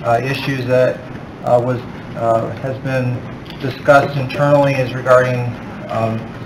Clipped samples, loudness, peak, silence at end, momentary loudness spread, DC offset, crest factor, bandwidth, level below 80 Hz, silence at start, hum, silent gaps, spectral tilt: under 0.1%; -16 LUFS; 0 dBFS; 0 s; 13 LU; under 0.1%; 16 dB; 15.5 kHz; -46 dBFS; 0 s; none; none; -7 dB/octave